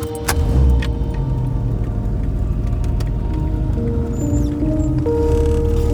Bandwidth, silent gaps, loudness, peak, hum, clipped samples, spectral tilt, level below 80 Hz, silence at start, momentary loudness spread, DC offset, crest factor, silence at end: 18 kHz; none; -19 LUFS; -2 dBFS; none; under 0.1%; -7 dB/octave; -20 dBFS; 0 s; 5 LU; under 0.1%; 16 dB; 0 s